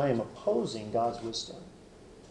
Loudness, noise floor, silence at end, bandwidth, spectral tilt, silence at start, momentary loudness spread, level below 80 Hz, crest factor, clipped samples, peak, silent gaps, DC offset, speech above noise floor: -32 LUFS; -53 dBFS; 0 s; 11 kHz; -5.5 dB/octave; 0 s; 22 LU; -60 dBFS; 18 dB; under 0.1%; -14 dBFS; none; under 0.1%; 21 dB